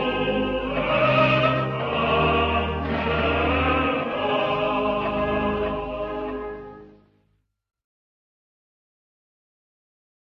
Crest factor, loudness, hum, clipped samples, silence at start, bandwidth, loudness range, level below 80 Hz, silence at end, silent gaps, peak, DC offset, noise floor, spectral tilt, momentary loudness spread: 16 dB; -23 LUFS; none; under 0.1%; 0 s; 6.8 kHz; 14 LU; -38 dBFS; 3.4 s; none; -8 dBFS; under 0.1%; -69 dBFS; -7.5 dB/octave; 10 LU